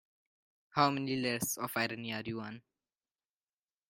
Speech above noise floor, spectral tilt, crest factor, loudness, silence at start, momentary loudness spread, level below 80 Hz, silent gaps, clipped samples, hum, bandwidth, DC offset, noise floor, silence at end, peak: over 55 dB; -4 dB/octave; 24 dB; -34 LUFS; 0.75 s; 12 LU; -74 dBFS; none; under 0.1%; none; 16.5 kHz; under 0.1%; under -90 dBFS; 1.3 s; -12 dBFS